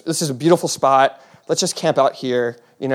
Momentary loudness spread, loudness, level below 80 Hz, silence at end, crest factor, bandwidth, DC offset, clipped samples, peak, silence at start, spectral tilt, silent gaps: 7 LU; -18 LUFS; -72 dBFS; 0 s; 18 dB; 16 kHz; under 0.1%; under 0.1%; -2 dBFS; 0.05 s; -4 dB/octave; none